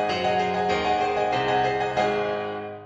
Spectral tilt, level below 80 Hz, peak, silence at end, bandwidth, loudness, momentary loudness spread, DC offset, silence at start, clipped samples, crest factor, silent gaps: -5 dB/octave; -52 dBFS; -10 dBFS; 0 s; 8.4 kHz; -24 LUFS; 4 LU; under 0.1%; 0 s; under 0.1%; 14 dB; none